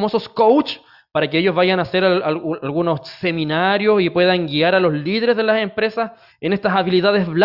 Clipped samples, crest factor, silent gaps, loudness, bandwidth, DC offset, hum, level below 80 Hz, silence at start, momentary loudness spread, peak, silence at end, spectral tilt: under 0.1%; 16 dB; none; -18 LUFS; 5.8 kHz; under 0.1%; none; -58 dBFS; 0 s; 8 LU; -2 dBFS; 0 s; -8 dB/octave